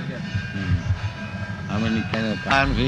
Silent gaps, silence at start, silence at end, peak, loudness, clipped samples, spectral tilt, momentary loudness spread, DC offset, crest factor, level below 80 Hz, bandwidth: none; 0 s; 0 s; -4 dBFS; -25 LUFS; under 0.1%; -6 dB/octave; 10 LU; under 0.1%; 20 dB; -36 dBFS; 9 kHz